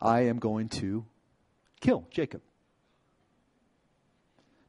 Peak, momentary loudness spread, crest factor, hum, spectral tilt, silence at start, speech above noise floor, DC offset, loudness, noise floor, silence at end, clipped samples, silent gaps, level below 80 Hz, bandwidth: -10 dBFS; 11 LU; 22 dB; none; -7 dB/octave; 0 s; 42 dB; under 0.1%; -30 LUFS; -71 dBFS; 2.3 s; under 0.1%; none; -62 dBFS; 11 kHz